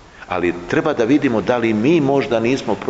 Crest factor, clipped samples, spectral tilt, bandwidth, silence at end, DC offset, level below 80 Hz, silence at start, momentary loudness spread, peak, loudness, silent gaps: 14 dB; under 0.1%; -6.5 dB/octave; 8 kHz; 0 s; under 0.1%; -48 dBFS; 0.15 s; 5 LU; -4 dBFS; -17 LUFS; none